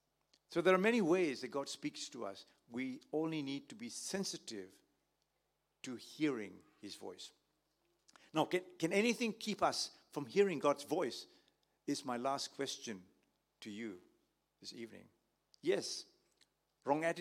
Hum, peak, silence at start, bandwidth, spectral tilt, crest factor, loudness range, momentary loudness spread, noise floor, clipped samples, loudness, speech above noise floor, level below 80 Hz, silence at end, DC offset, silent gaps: none; -16 dBFS; 0.5 s; 16 kHz; -4 dB/octave; 24 dB; 9 LU; 19 LU; -84 dBFS; under 0.1%; -39 LUFS; 46 dB; -86 dBFS; 0 s; under 0.1%; none